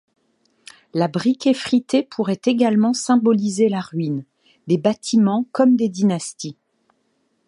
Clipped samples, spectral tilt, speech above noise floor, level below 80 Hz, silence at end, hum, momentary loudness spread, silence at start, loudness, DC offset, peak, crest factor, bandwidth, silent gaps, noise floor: under 0.1%; -6 dB/octave; 49 dB; -68 dBFS; 0.95 s; none; 10 LU; 0.95 s; -19 LUFS; under 0.1%; -2 dBFS; 18 dB; 11 kHz; none; -67 dBFS